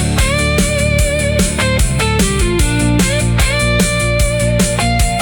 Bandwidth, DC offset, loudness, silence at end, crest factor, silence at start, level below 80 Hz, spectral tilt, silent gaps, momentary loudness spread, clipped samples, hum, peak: 18 kHz; under 0.1%; -13 LUFS; 0 s; 12 dB; 0 s; -18 dBFS; -4.5 dB/octave; none; 1 LU; under 0.1%; none; -2 dBFS